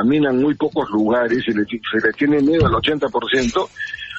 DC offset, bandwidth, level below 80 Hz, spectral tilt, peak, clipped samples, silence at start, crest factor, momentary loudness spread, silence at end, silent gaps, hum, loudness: under 0.1%; 8 kHz; -40 dBFS; -6 dB/octave; -4 dBFS; under 0.1%; 0 s; 14 dB; 6 LU; 0 s; none; none; -18 LUFS